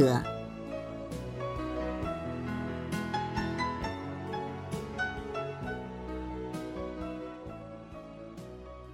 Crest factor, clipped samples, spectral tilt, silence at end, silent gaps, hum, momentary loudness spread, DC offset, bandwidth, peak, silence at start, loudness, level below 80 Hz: 24 dB; under 0.1%; -6.5 dB/octave; 0 s; none; none; 12 LU; under 0.1%; 16 kHz; -12 dBFS; 0 s; -37 LUFS; -50 dBFS